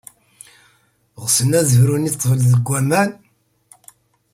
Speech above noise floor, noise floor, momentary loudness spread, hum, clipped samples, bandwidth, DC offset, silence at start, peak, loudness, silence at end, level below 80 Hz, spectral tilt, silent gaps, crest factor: 44 dB; -59 dBFS; 5 LU; none; under 0.1%; 16 kHz; under 0.1%; 1.2 s; -2 dBFS; -16 LUFS; 1.2 s; -52 dBFS; -5 dB/octave; none; 16 dB